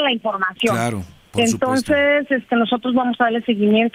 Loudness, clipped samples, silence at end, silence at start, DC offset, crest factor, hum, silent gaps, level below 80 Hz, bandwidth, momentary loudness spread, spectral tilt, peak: -18 LUFS; under 0.1%; 0.05 s; 0 s; under 0.1%; 14 dB; none; none; -56 dBFS; 15.5 kHz; 6 LU; -4.5 dB/octave; -4 dBFS